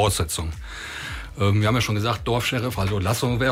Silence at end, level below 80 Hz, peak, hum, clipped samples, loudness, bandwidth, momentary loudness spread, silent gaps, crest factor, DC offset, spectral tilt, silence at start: 0 s; -38 dBFS; -10 dBFS; none; under 0.1%; -24 LUFS; 16 kHz; 12 LU; none; 14 dB; under 0.1%; -5 dB/octave; 0 s